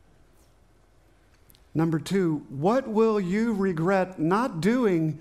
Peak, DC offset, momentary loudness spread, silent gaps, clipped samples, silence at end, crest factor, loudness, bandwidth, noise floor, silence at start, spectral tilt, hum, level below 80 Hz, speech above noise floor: -10 dBFS; under 0.1%; 4 LU; none; under 0.1%; 0 s; 16 dB; -25 LUFS; 14.5 kHz; -60 dBFS; 1.75 s; -7.5 dB/octave; none; -58 dBFS; 36 dB